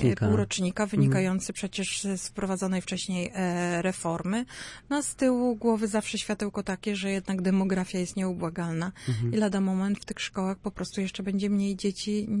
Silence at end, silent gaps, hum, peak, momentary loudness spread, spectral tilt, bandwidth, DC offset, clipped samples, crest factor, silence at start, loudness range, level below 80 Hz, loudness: 0 s; none; none; -12 dBFS; 7 LU; -5.5 dB/octave; 11.5 kHz; under 0.1%; under 0.1%; 16 dB; 0 s; 2 LU; -56 dBFS; -29 LUFS